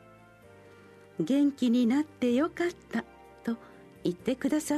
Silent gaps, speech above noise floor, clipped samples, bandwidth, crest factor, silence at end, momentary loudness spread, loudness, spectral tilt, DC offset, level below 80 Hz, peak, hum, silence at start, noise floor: none; 27 dB; under 0.1%; 13.5 kHz; 14 dB; 0 s; 12 LU; -30 LUFS; -5.5 dB/octave; under 0.1%; -66 dBFS; -16 dBFS; none; 1.2 s; -55 dBFS